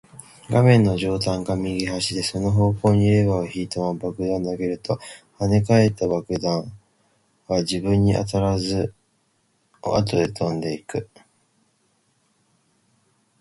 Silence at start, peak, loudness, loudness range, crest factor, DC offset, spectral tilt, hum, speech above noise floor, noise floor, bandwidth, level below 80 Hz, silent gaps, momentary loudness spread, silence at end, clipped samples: 0.5 s; -2 dBFS; -22 LUFS; 7 LU; 20 dB; under 0.1%; -6.5 dB/octave; none; 46 dB; -67 dBFS; 11.5 kHz; -44 dBFS; none; 11 LU; 2.35 s; under 0.1%